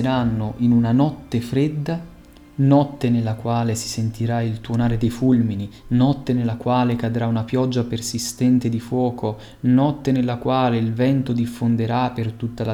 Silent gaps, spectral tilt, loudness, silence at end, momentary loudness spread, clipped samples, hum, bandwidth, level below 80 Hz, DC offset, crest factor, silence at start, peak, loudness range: none; -7 dB/octave; -21 LUFS; 0 s; 7 LU; under 0.1%; none; 15.5 kHz; -44 dBFS; under 0.1%; 16 dB; 0 s; -4 dBFS; 1 LU